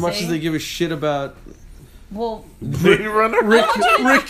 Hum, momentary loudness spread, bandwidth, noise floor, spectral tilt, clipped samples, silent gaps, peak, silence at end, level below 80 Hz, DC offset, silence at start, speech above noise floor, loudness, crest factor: none; 13 LU; 15.5 kHz; -41 dBFS; -5 dB/octave; under 0.1%; none; 0 dBFS; 0 s; -44 dBFS; under 0.1%; 0 s; 23 dB; -18 LUFS; 18 dB